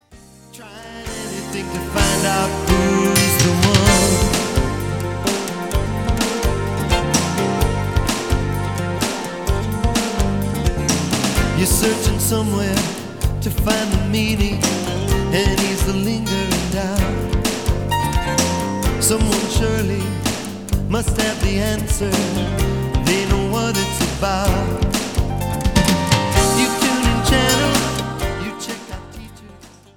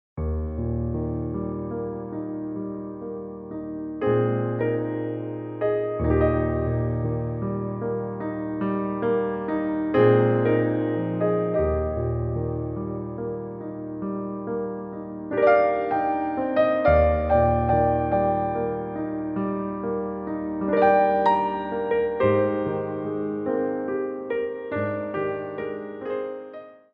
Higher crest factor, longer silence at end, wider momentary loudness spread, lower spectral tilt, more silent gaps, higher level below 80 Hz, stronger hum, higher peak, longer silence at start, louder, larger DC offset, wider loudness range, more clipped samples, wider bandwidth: about the same, 18 dB vs 18 dB; about the same, 0.3 s vs 0.2 s; second, 9 LU vs 12 LU; second, -4.5 dB/octave vs -11 dB/octave; neither; first, -26 dBFS vs -40 dBFS; neither; first, 0 dBFS vs -6 dBFS; about the same, 0.1 s vs 0.15 s; first, -18 LUFS vs -25 LUFS; first, 0.5% vs under 0.1%; second, 4 LU vs 7 LU; neither; first, 18 kHz vs 5.4 kHz